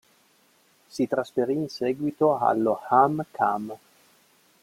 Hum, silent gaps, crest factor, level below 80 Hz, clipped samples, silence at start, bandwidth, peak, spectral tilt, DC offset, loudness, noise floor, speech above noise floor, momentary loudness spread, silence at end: none; none; 22 dB; -70 dBFS; under 0.1%; 0.95 s; 16 kHz; -4 dBFS; -7 dB/octave; under 0.1%; -25 LUFS; -62 dBFS; 38 dB; 11 LU; 0.85 s